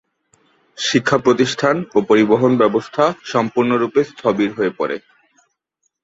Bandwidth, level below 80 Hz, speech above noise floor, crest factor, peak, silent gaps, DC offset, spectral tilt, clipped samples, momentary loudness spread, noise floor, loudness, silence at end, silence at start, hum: 8 kHz; -58 dBFS; 55 dB; 16 dB; -2 dBFS; none; under 0.1%; -5 dB/octave; under 0.1%; 7 LU; -71 dBFS; -17 LUFS; 1.05 s; 0.8 s; none